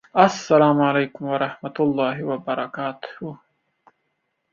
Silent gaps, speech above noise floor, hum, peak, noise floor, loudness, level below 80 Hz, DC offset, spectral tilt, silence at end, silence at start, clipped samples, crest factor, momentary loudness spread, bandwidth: none; 53 dB; none; -2 dBFS; -74 dBFS; -21 LUFS; -66 dBFS; under 0.1%; -6 dB/octave; 1.15 s; 0.15 s; under 0.1%; 20 dB; 17 LU; 7.6 kHz